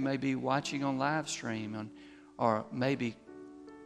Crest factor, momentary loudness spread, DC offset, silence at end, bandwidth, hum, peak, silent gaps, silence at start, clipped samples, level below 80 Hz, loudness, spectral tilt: 20 dB; 19 LU; under 0.1%; 0 s; 11.5 kHz; none; -14 dBFS; none; 0 s; under 0.1%; -72 dBFS; -34 LUFS; -5 dB/octave